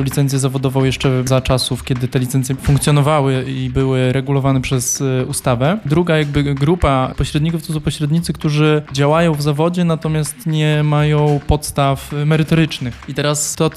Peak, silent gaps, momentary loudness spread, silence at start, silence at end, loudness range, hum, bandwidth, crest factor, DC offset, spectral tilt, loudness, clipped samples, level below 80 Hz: 0 dBFS; none; 5 LU; 0 s; 0 s; 1 LU; none; 14.5 kHz; 14 dB; under 0.1%; -5.5 dB/octave; -16 LUFS; under 0.1%; -32 dBFS